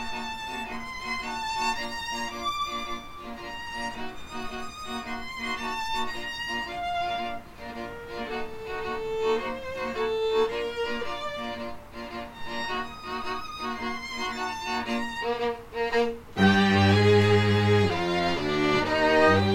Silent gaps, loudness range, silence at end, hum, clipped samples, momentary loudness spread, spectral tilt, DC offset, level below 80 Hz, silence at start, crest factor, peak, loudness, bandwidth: none; 11 LU; 0 s; none; under 0.1%; 16 LU; -5.5 dB/octave; under 0.1%; -50 dBFS; 0 s; 18 dB; -8 dBFS; -28 LUFS; 16.5 kHz